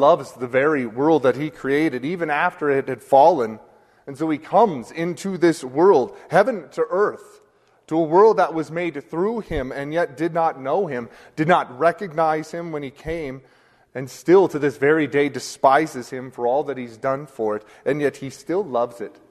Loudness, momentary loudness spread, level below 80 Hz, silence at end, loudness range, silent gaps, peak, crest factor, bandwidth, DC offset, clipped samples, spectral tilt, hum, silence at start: -21 LUFS; 14 LU; -52 dBFS; 0.2 s; 4 LU; none; -2 dBFS; 20 dB; 13.5 kHz; under 0.1%; under 0.1%; -6 dB/octave; none; 0 s